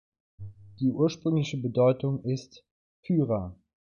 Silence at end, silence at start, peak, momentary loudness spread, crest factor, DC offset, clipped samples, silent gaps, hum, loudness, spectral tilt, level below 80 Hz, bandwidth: 0.35 s; 0.4 s; -12 dBFS; 22 LU; 16 dB; under 0.1%; under 0.1%; 2.71-3.03 s; none; -28 LUFS; -8 dB/octave; -56 dBFS; 7.4 kHz